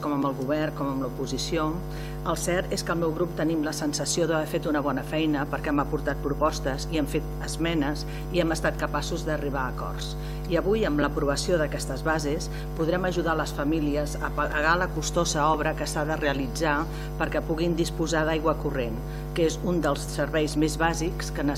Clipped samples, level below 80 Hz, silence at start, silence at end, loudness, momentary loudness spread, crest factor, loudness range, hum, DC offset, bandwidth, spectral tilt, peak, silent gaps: under 0.1%; -36 dBFS; 0 s; 0 s; -27 LUFS; 6 LU; 18 dB; 2 LU; none; under 0.1%; 16 kHz; -5 dB/octave; -8 dBFS; none